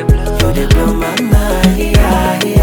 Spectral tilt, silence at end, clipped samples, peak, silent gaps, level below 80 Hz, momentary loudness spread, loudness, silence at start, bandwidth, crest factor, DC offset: -6 dB/octave; 0 s; under 0.1%; 0 dBFS; none; -14 dBFS; 3 LU; -12 LUFS; 0 s; 19.5 kHz; 10 dB; under 0.1%